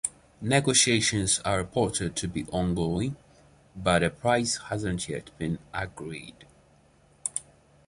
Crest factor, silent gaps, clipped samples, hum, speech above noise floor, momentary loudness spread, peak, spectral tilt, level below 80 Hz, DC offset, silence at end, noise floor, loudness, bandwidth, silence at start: 22 dB; none; under 0.1%; none; 33 dB; 15 LU; -6 dBFS; -3.5 dB/octave; -48 dBFS; under 0.1%; 0.45 s; -60 dBFS; -27 LUFS; 11.5 kHz; 0.05 s